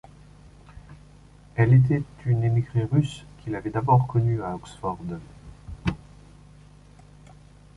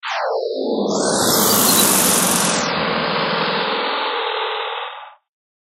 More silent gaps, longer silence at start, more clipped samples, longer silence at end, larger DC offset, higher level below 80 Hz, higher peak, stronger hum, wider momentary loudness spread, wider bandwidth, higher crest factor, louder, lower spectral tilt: neither; first, 0.75 s vs 0.05 s; neither; first, 1.8 s vs 0.6 s; neither; first, -48 dBFS vs -58 dBFS; second, -6 dBFS vs 0 dBFS; first, 50 Hz at -45 dBFS vs none; first, 18 LU vs 11 LU; second, 10.5 kHz vs 16 kHz; about the same, 20 dB vs 18 dB; second, -24 LUFS vs -16 LUFS; first, -8.5 dB/octave vs -2 dB/octave